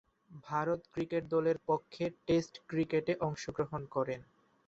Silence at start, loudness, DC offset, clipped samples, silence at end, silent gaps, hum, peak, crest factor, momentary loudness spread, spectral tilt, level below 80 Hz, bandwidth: 0.3 s; -35 LUFS; under 0.1%; under 0.1%; 0.45 s; none; none; -18 dBFS; 16 dB; 7 LU; -6.5 dB/octave; -66 dBFS; 8 kHz